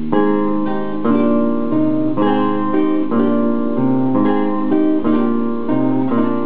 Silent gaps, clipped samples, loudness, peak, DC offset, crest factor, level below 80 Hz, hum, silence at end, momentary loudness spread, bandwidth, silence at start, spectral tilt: none; under 0.1%; -17 LUFS; 0 dBFS; 8%; 16 dB; -54 dBFS; none; 0 s; 3 LU; 4.3 kHz; 0 s; -12 dB/octave